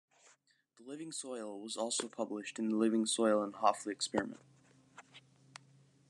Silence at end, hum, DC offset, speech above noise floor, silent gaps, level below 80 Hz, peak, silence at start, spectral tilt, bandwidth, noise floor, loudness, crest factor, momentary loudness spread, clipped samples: 0.9 s; none; under 0.1%; 35 dB; none; -82 dBFS; -14 dBFS; 0.8 s; -3.5 dB/octave; 12.5 kHz; -70 dBFS; -36 LUFS; 24 dB; 25 LU; under 0.1%